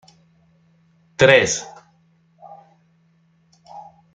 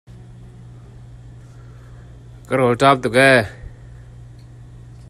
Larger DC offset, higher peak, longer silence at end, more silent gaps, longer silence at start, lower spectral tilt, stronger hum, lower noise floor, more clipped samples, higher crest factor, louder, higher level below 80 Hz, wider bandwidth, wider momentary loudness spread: neither; about the same, -2 dBFS vs 0 dBFS; about the same, 0.35 s vs 0.45 s; neither; first, 1.2 s vs 0.45 s; second, -3 dB/octave vs -5.5 dB/octave; neither; first, -59 dBFS vs -40 dBFS; neither; about the same, 22 dB vs 20 dB; about the same, -15 LUFS vs -15 LUFS; second, -58 dBFS vs -44 dBFS; second, 9.4 kHz vs 13 kHz; first, 29 LU vs 23 LU